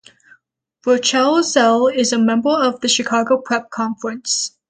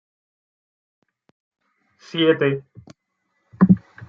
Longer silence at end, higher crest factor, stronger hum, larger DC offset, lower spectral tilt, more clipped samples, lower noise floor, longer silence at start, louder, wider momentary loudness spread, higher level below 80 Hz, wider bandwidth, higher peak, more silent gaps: first, 0.2 s vs 0.05 s; second, 16 dB vs 22 dB; neither; neither; second, -2.5 dB/octave vs -8.5 dB/octave; neither; second, -59 dBFS vs -72 dBFS; second, 0.85 s vs 2.15 s; first, -16 LUFS vs -19 LUFS; second, 9 LU vs 12 LU; about the same, -64 dBFS vs -60 dBFS; first, 9.6 kHz vs 6.4 kHz; about the same, 0 dBFS vs -2 dBFS; neither